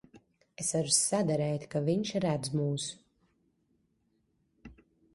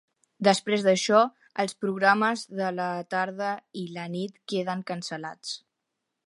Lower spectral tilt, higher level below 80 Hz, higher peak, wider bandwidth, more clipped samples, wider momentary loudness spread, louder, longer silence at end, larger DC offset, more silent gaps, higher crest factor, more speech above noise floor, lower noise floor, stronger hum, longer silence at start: about the same, -4.5 dB/octave vs -4.5 dB/octave; first, -66 dBFS vs -78 dBFS; second, -12 dBFS vs -4 dBFS; about the same, 11.5 kHz vs 11.5 kHz; neither; second, 9 LU vs 14 LU; second, -30 LUFS vs -27 LUFS; second, 0.4 s vs 0.7 s; neither; neither; about the same, 22 dB vs 22 dB; second, 44 dB vs 56 dB; second, -75 dBFS vs -83 dBFS; neither; second, 0.15 s vs 0.4 s